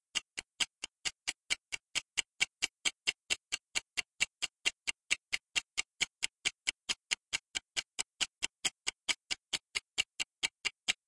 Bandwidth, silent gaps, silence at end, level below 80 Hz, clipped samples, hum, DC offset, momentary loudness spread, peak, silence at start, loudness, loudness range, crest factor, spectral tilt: 12 kHz; none; 0.15 s; -72 dBFS; under 0.1%; none; under 0.1%; 4 LU; -12 dBFS; 0.15 s; -36 LUFS; 1 LU; 26 dB; 2 dB/octave